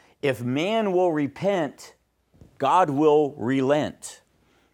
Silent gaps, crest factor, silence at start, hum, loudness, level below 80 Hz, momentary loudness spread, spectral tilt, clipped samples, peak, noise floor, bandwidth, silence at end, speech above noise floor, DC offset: none; 18 dB; 0.25 s; none; -23 LUFS; -66 dBFS; 11 LU; -6 dB/octave; under 0.1%; -6 dBFS; -63 dBFS; 16.5 kHz; 0.6 s; 40 dB; under 0.1%